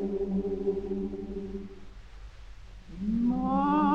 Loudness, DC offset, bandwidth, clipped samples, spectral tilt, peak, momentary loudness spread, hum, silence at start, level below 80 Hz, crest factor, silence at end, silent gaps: -30 LUFS; under 0.1%; 7.2 kHz; under 0.1%; -9 dB/octave; -14 dBFS; 24 LU; none; 0 s; -46 dBFS; 16 dB; 0 s; none